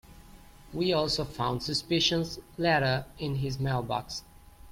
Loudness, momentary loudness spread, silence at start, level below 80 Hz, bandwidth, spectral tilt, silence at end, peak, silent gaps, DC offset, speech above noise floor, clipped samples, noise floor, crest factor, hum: -29 LUFS; 10 LU; 0.1 s; -50 dBFS; 16.5 kHz; -5 dB/octave; 0 s; -12 dBFS; none; under 0.1%; 22 dB; under 0.1%; -51 dBFS; 18 dB; none